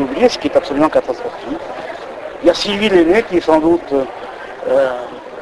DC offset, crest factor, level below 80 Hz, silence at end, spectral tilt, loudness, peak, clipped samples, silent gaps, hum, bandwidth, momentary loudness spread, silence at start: under 0.1%; 16 dB; -44 dBFS; 0 s; -5 dB/octave; -15 LUFS; 0 dBFS; under 0.1%; none; none; 11.5 kHz; 15 LU; 0 s